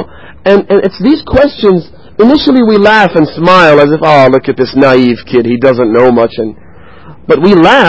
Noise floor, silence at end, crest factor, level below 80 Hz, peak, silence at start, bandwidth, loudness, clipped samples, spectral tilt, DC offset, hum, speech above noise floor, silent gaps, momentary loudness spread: -34 dBFS; 0 s; 6 dB; -34 dBFS; 0 dBFS; 0 s; 8 kHz; -7 LUFS; 3%; -7 dB/octave; 0.9%; none; 28 dB; none; 8 LU